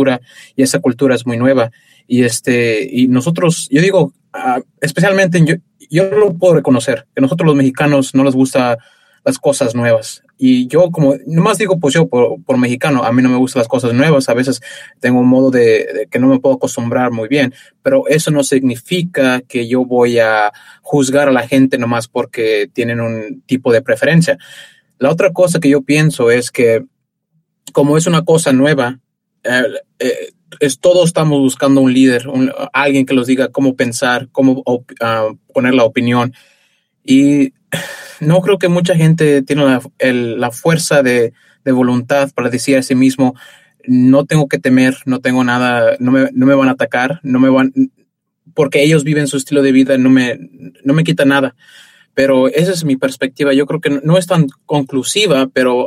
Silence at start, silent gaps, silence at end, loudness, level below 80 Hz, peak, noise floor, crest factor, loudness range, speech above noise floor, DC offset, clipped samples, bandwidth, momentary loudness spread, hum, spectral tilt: 0 s; none; 0 s; -13 LUFS; -56 dBFS; 0 dBFS; -63 dBFS; 12 dB; 2 LU; 52 dB; under 0.1%; under 0.1%; 15 kHz; 8 LU; none; -5.5 dB/octave